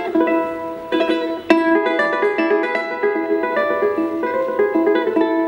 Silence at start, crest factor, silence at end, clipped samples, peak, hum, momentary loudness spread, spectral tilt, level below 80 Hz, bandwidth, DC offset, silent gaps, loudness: 0 s; 18 dB; 0 s; under 0.1%; 0 dBFS; none; 4 LU; -5.5 dB/octave; -60 dBFS; 15 kHz; under 0.1%; none; -18 LUFS